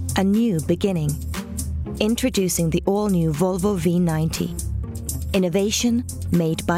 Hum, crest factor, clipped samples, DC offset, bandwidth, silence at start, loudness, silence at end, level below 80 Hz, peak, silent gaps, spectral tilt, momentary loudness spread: none; 16 dB; under 0.1%; under 0.1%; 16.5 kHz; 0 s; -22 LUFS; 0 s; -36 dBFS; -6 dBFS; none; -5.5 dB/octave; 9 LU